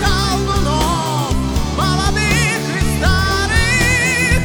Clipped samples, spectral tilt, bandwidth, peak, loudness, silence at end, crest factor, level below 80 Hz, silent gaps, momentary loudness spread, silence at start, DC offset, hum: under 0.1%; -4 dB/octave; over 20 kHz; -2 dBFS; -15 LUFS; 0 s; 14 dB; -22 dBFS; none; 5 LU; 0 s; under 0.1%; none